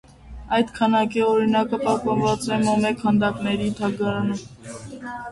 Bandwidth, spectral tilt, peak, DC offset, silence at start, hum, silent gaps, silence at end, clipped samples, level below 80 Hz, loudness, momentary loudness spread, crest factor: 11.5 kHz; -6 dB/octave; -6 dBFS; under 0.1%; 0.25 s; none; none; 0 s; under 0.1%; -48 dBFS; -22 LUFS; 14 LU; 16 dB